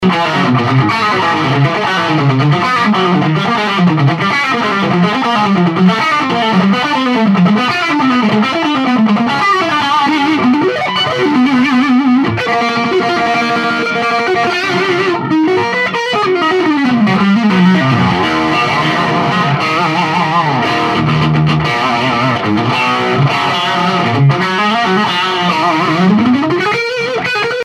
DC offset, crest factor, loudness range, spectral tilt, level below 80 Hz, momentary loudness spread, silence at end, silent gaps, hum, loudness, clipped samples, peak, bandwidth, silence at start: under 0.1%; 12 dB; 1 LU; -6 dB/octave; -48 dBFS; 3 LU; 0 s; none; none; -12 LUFS; under 0.1%; 0 dBFS; 13 kHz; 0 s